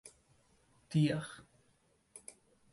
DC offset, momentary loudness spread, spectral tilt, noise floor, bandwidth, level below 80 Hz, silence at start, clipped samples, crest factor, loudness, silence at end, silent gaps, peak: under 0.1%; 24 LU; -6.5 dB/octave; -73 dBFS; 11.5 kHz; -72 dBFS; 0.05 s; under 0.1%; 20 dB; -34 LUFS; 0.55 s; none; -20 dBFS